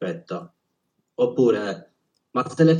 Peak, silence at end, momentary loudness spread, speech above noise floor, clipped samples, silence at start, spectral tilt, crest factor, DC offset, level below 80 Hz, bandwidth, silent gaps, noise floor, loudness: -6 dBFS; 0 s; 16 LU; 53 dB; under 0.1%; 0 s; -7.5 dB/octave; 18 dB; under 0.1%; -80 dBFS; 9.8 kHz; none; -74 dBFS; -24 LUFS